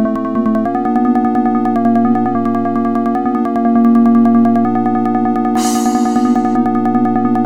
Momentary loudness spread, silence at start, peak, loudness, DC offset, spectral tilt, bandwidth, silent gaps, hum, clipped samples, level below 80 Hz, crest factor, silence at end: 5 LU; 0 s; -2 dBFS; -13 LUFS; 2%; -6.5 dB/octave; 13.5 kHz; none; none; under 0.1%; -50 dBFS; 12 dB; 0 s